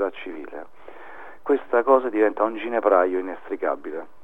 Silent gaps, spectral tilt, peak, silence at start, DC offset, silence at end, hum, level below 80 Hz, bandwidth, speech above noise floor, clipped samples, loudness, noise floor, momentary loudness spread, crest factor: none; -6.5 dB/octave; -4 dBFS; 0 s; 1%; 0.2 s; none; -68 dBFS; 3.9 kHz; 23 dB; under 0.1%; -22 LUFS; -45 dBFS; 22 LU; 20 dB